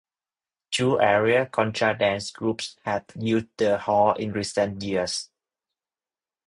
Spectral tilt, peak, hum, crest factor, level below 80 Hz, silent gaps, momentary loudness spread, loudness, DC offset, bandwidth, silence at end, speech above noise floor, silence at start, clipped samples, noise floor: -4.5 dB/octave; -6 dBFS; none; 20 dB; -58 dBFS; none; 9 LU; -24 LUFS; under 0.1%; 11 kHz; 1.2 s; over 66 dB; 0.7 s; under 0.1%; under -90 dBFS